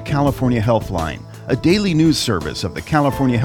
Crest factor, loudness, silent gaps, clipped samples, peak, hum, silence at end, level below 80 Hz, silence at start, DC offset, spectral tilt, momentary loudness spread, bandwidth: 14 dB; -18 LUFS; none; under 0.1%; -2 dBFS; none; 0 s; -36 dBFS; 0 s; under 0.1%; -6 dB/octave; 9 LU; 17.5 kHz